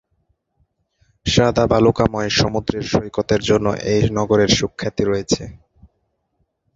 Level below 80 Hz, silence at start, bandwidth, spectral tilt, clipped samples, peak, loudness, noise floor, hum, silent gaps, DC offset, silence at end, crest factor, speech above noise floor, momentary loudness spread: -38 dBFS; 1.25 s; 7.8 kHz; -5 dB/octave; under 0.1%; 0 dBFS; -18 LUFS; -70 dBFS; none; none; under 0.1%; 1.25 s; 18 dB; 52 dB; 8 LU